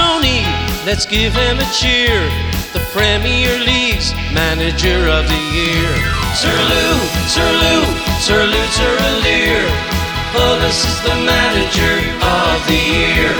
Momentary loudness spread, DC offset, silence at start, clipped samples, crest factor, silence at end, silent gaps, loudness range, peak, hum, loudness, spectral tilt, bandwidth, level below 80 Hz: 5 LU; under 0.1%; 0 s; under 0.1%; 14 dB; 0 s; none; 1 LU; 0 dBFS; none; -13 LUFS; -3.5 dB/octave; over 20 kHz; -22 dBFS